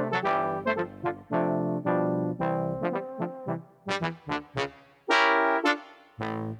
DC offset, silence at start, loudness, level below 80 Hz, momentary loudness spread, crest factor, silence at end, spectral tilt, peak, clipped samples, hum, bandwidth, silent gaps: under 0.1%; 0 s; -28 LUFS; -64 dBFS; 12 LU; 22 dB; 0 s; -6 dB/octave; -6 dBFS; under 0.1%; none; 11 kHz; none